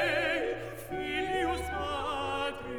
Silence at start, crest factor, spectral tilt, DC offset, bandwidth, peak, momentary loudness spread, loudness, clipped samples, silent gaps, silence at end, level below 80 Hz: 0 s; 14 dB; -4.5 dB/octave; under 0.1%; over 20 kHz; -18 dBFS; 7 LU; -32 LUFS; under 0.1%; none; 0 s; -48 dBFS